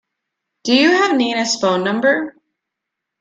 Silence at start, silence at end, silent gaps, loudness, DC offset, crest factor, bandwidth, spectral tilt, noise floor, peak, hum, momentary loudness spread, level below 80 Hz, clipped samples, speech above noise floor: 0.65 s; 0.9 s; none; -15 LUFS; under 0.1%; 16 dB; 9.4 kHz; -3.5 dB/octave; -80 dBFS; -2 dBFS; none; 9 LU; -66 dBFS; under 0.1%; 65 dB